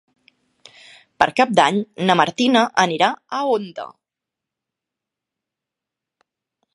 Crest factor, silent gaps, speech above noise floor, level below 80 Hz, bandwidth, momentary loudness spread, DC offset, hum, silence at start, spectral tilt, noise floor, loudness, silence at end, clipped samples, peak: 22 dB; none; 67 dB; -62 dBFS; 11.5 kHz; 10 LU; under 0.1%; none; 1.2 s; -4.5 dB/octave; -85 dBFS; -18 LUFS; 2.85 s; under 0.1%; 0 dBFS